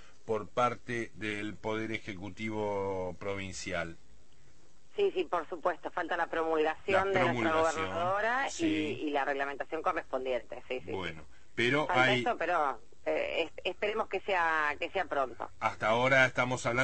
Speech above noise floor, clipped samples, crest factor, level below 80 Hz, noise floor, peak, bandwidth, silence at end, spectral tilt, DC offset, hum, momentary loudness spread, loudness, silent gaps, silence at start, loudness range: 32 dB; under 0.1%; 22 dB; -62 dBFS; -64 dBFS; -10 dBFS; 8.8 kHz; 0 s; -4.5 dB/octave; 0.5%; none; 11 LU; -32 LUFS; none; 0.25 s; 6 LU